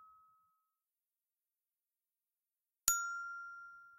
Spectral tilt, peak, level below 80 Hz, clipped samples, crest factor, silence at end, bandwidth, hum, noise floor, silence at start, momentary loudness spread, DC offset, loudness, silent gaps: 2.5 dB/octave; -8 dBFS; -76 dBFS; under 0.1%; 38 dB; 0 s; 15.5 kHz; none; under -90 dBFS; 0 s; 17 LU; under 0.1%; -37 LUFS; none